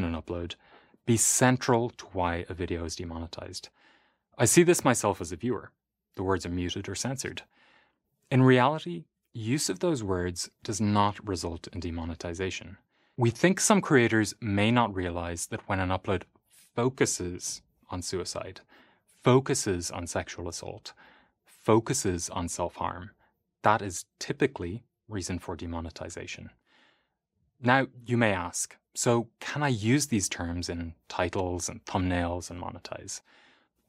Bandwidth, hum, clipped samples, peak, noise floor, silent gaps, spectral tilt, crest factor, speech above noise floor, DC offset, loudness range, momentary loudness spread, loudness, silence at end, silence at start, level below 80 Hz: 16 kHz; none; under 0.1%; -6 dBFS; -76 dBFS; none; -4.5 dB/octave; 24 dB; 48 dB; under 0.1%; 6 LU; 16 LU; -28 LUFS; 0.7 s; 0 s; -54 dBFS